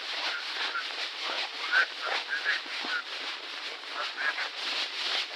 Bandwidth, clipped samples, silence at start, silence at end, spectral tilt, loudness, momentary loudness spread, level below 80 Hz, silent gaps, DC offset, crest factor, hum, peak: 16 kHz; under 0.1%; 0 s; 0 s; 2.5 dB/octave; -30 LUFS; 8 LU; under -90 dBFS; none; under 0.1%; 20 dB; none; -12 dBFS